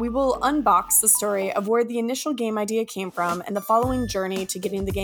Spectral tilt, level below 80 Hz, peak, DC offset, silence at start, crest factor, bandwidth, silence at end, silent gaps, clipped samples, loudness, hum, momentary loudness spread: -3.5 dB/octave; -44 dBFS; -4 dBFS; under 0.1%; 0 s; 20 dB; 19 kHz; 0 s; none; under 0.1%; -22 LUFS; none; 10 LU